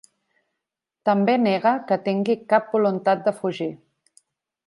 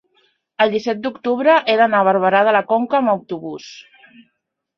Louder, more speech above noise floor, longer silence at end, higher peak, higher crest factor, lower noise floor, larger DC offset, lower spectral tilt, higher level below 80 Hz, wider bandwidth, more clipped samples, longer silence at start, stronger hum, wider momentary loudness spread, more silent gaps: second, -22 LUFS vs -16 LUFS; first, 63 dB vs 57 dB; about the same, 0.9 s vs 0.95 s; second, -6 dBFS vs -2 dBFS; about the same, 18 dB vs 16 dB; first, -84 dBFS vs -73 dBFS; neither; first, -7 dB/octave vs -5.5 dB/octave; second, -76 dBFS vs -68 dBFS; first, 11.5 kHz vs 6.8 kHz; neither; first, 1.05 s vs 0.6 s; neither; second, 8 LU vs 14 LU; neither